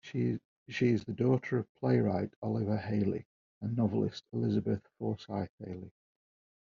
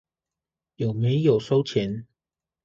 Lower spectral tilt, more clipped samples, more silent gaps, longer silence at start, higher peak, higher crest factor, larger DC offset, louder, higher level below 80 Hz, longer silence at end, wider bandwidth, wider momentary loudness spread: about the same, -7.5 dB/octave vs -8 dB/octave; neither; first, 0.45-0.66 s, 1.69-1.75 s, 2.36-2.42 s, 3.25-3.61 s, 5.49-5.58 s vs none; second, 0.05 s vs 0.8 s; second, -14 dBFS vs -8 dBFS; about the same, 18 dB vs 18 dB; neither; second, -33 LUFS vs -24 LUFS; second, -68 dBFS vs -60 dBFS; first, 0.8 s vs 0.6 s; about the same, 7.2 kHz vs 7.4 kHz; about the same, 12 LU vs 10 LU